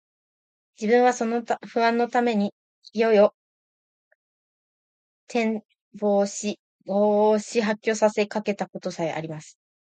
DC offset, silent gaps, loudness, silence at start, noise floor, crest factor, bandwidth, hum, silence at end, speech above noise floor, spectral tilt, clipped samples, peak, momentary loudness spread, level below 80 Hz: under 0.1%; 2.52-2.82 s, 3.34-5.27 s, 5.81-5.91 s, 6.59-6.79 s; -24 LUFS; 0.8 s; under -90 dBFS; 18 dB; 9.2 kHz; none; 0.4 s; over 67 dB; -5 dB/octave; under 0.1%; -6 dBFS; 12 LU; -76 dBFS